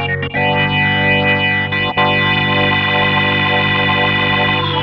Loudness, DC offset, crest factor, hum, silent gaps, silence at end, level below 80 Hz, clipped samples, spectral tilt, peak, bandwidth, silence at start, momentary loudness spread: -13 LUFS; under 0.1%; 12 dB; 50 Hz at -45 dBFS; none; 0 s; -42 dBFS; under 0.1%; -7 dB/octave; -2 dBFS; 6 kHz; 0 s; 2 LU